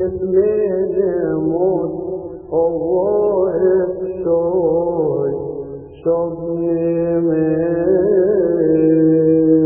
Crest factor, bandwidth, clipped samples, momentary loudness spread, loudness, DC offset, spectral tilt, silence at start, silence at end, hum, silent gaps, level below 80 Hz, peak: 12 dB; 2.7 kHz; under 0.1%; 9 LU; -17 LUFS; under 0.1%; -14.5 dB/octave; 0 s; 0 s; none; none; -46 dBFS; -4 dBFS